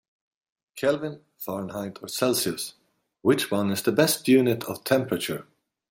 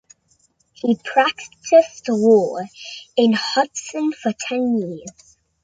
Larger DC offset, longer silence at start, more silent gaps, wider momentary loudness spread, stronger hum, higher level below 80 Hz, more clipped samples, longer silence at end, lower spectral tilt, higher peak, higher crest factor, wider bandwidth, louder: neither; about the same, 0.75 s vs 0.85 s; neither; about the same, 14 LU vs 16 LU; neither; about the same, -68 dBFS vs -66 dBFS; neither; about the same, 0.5 s vs 0.55 s; about the same, -4.5 dB/octave vs -4.5 dB/octave; second, -6 dBFS vs -2 dBFS; about the same, 20 dB vs 18 dB; first, 16.5 kHz vs 9.4 kHz; second, -25 LUFS vs -19 LUFS